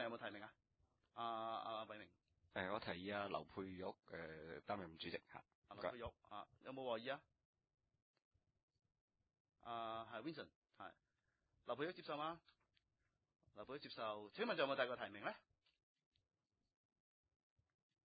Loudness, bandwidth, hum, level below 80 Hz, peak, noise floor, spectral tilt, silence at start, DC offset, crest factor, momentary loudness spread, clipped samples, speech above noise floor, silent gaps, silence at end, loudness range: -49 LUFS; 4.8 kHz; none; -78 dBFS; -26 dBFS; -89 dBFS; -2.5 dB/octave; 0 s; under 0.1%; 26 dB; 15 LU; under 0.1%; 40 dB; 5.55-5.62 s, 7.45-7.53 s, 8.02-8.14 s, 8.25-8.31 s, 8.63-8.68 s, 9.01-9.08 s, 9.40-9.45 s, 10.56-10.62 s; 2.65 s; 8 LU